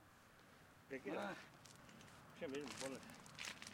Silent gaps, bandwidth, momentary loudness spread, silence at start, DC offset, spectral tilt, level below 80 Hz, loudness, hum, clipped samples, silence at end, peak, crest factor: none; 16.5 kHz; 18 LU; 0 s; under 0.1%; -3.5 dB/octave; -80 dBFS; -52 LUFS; none; under 0.1%; 0 s; -28 dBFS; 26 dB